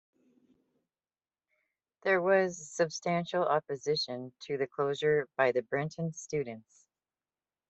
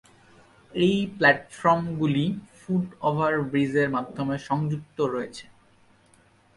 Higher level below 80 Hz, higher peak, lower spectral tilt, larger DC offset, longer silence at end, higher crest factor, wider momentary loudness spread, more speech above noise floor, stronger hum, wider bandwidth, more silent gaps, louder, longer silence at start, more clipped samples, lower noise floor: second, -76 dBFS vs -60 dBFS; second, -14 dBFS vs -6 dBFS; second, -4.5 dB/octave vs -7 dB/octave; neither; about the same, 1.1 s vs 1.15 s; about the same, 20 dB vs 20 dB; about the same, 9 LU vs 10 LU; first, over 59 dB vs 35 dB; neither; second, 8.2 kHz vs 11.5 kHz; neither; second, -31 LUFS vs -25 LUFS; first, 2.05 s vs 0.75 s; neither; first, under -90 dBFS vs -59 dBFS